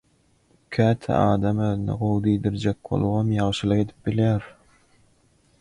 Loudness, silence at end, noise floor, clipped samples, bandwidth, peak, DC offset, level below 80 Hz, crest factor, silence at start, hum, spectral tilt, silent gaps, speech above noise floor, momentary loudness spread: -23 LUFS; 1.1 s; -62 dBFS; under 0.1%; 10.5 kHz; -8 dBFS; under 0.1%; -46 dBFS; 16 dB; 0.7 s; none; -8 dB/octave; none; 40 dB; 5 LU